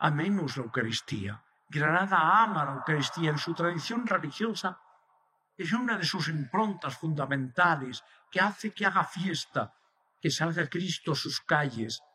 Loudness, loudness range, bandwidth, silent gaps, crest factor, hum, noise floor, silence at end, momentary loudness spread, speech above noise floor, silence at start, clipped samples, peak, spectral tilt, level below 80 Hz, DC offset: -29 LUFS; 4 LU; 14 kHz; none; 20 dB; none; -70 dBFS; 0.15 s; 10 LU; 41 dB; 0 s; under 0.1%; -10 dBFS; -5 dB/octave; -76 dBFS; under 0.1%